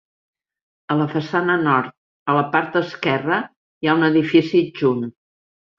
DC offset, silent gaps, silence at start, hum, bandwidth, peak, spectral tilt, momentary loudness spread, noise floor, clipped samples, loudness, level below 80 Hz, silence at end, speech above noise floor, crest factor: under 0.1%; 1.97-2.26 s, 3.56-3.81 s; 0.9 s; none; 6.8 kHz; -2 dBFS; -7.5 dB/octave; 9 LU; under -90 dBFS; under 0.1%; -19 LUFS; -64 dBFS; 0.7 s; over 72 dB; 18 dB